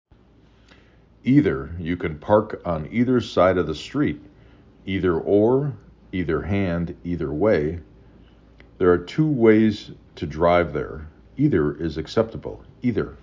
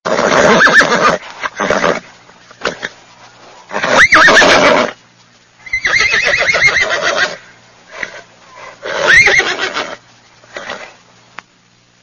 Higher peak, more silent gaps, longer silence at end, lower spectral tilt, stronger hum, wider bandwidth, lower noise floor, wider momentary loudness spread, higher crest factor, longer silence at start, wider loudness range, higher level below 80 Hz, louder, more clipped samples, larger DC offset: about the same, -2 dBFS vs 0 dBFS; neither; second, 0.05 s vs 1.15 s; first, -8 dB/octave vs -2 dB/octave; neither; second, 7.6 kHz vs 11 kHz; first, -54 dBFS vs -50 dBFS; second, 15 LU vs 20 LU; first, 20 dB vs 14 dB; first, 1.25 s vs 0.05 s; about the same, 3 LU vs 4 LU; about the same, -42 dBFS vs -42 dBFS; second, -22 LUFS vs -9 LUFS; second, under 0.1% vs 0.2%; neither